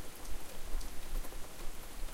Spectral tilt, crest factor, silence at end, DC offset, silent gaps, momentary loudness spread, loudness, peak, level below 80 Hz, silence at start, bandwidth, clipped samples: -3.5 dB/octave; 14 dB; 0 s; under 0.1%; none; 3 LU; -47 LUFS; -22 dBFS; -40 dBFS; 0 s; 16.5 kHz; under 0.1%